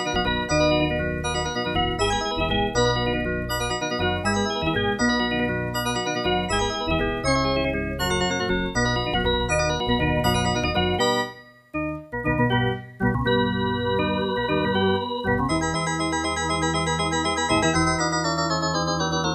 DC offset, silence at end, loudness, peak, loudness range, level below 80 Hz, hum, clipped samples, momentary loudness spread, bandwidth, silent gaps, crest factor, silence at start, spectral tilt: under 0.1%; 0 s; -23 LUFS; -8 dBFS; 1 LU; -36 dBFS; none; under 0.1%; 4 LU; 14 kHz; none; 16 dB; 0 s; -4.5 dB/octave